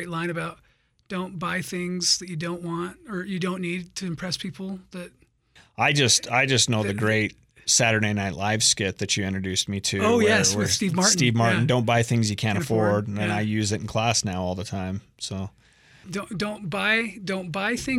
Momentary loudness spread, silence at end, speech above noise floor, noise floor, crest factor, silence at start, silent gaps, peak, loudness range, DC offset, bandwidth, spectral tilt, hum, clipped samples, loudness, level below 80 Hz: 14 LU; 0 s; 33 dB; -58 dBFS; 18 dB; 0 s; none; -6 dBFS; 7 LU; under 0.1%; 16 kHz; -3.5 dB/octave; none; under 0.1%; -23 LUFS; -56 dBFS